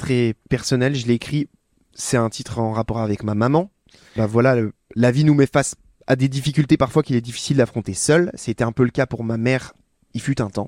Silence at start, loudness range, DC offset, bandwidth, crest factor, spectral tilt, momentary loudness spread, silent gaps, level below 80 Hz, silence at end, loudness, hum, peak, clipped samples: 0 s; 4 LU; under 0.1%; 15.5 kHz; 18 dB; -6 dB/octave; 9 LU; none; -48 dBFS; 0 s; -20 LUFS; none; -2 dBFS; under 0.1%